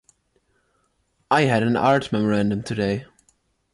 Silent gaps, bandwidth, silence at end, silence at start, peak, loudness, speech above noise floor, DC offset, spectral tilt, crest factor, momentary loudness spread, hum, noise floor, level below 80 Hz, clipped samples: none; 11.5 kHz; 0.7 s; 1.3 s; -6 dBFS; -21 LUFS; 48 dB; under 0.1%; -6.5 dB/octave; 16 dB; 6 LU; none; -68 dBFS; -54 dBFS; under 0.1%